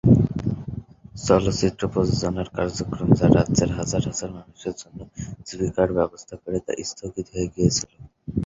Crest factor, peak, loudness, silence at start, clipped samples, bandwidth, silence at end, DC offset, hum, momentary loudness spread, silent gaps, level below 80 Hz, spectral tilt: 20 dB; -2 dBFS; -23 LUFS; 0.05 s; under 0.1%; 7.8 kHz; 0 s; under 0.1%; none; 17 LU; none; -40 dBFS; -6 dB/octave